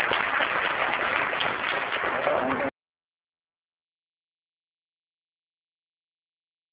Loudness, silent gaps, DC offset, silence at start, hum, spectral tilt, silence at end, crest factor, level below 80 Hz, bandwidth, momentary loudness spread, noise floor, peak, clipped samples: -25 LUFS; none; under 0.1%; 0 s; none; 0 dB/octave; 4 s; 24 dB; -62 dBFS; 4 kHz; 3 LU; under -90 dBFS; -6 dBFS; under 0.1%